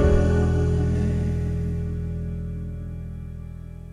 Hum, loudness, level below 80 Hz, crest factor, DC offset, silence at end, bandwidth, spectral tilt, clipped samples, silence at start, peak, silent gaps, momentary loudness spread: none; -25 LUFS; -28 dBFS; 16 dB; under 0.1%; 0 s; 9.8 kHz; -8.5 dB/octave; under 0.1%; 0 s; -6 dBFS; none; 16 LU